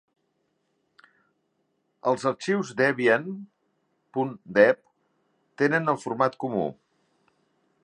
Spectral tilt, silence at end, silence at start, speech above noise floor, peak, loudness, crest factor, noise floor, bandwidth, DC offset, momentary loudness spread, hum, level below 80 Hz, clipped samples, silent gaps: -6 dB/octave; 1.1 s; 2.05 s; 50 dB; -4 dBFS; -25 LUFS; 24 dB; -74 dBFS; 10 kHz; under 0.1%; 12 LU; none; -74 dBFS; under 0.1%; none